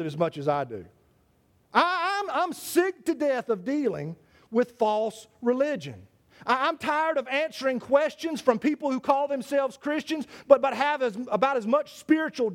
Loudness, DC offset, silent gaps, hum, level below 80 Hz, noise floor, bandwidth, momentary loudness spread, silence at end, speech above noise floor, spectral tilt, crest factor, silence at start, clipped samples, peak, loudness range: -26 LUFS; under 0.1%; none; none; -70 dBFS; -65 dBFS; 17.5 kHz; 7 LU; 0 s; 39 dB; -5 dB/octave; 24 dB; 0 s; under 0.1%; -2 dBFS; 3 LU